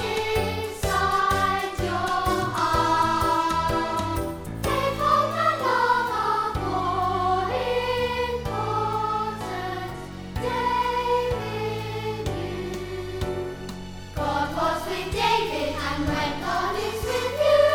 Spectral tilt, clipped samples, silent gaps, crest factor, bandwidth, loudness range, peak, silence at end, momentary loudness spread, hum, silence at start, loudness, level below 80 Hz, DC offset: -5 dB/octave; under 0.1%; none; 16 dB; over 20 kHz; 5 LU; -8 dBFS; 0 s; 9 LU; none; 0 s; -25 LUFS; -40 dBFS; under 0.1%